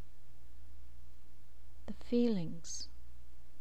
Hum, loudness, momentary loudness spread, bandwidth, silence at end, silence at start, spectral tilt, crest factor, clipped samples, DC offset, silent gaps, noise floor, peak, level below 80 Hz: 60 Hz at -60 dBFS; -37 LUFS; 28 LU; 12.5 kHz; 0 s; 0.05 s; -5.5 dB/octave; 20 dB; under 0.1%; 2%; none; -56 dBFS; -20 dBFS; -58 dBFS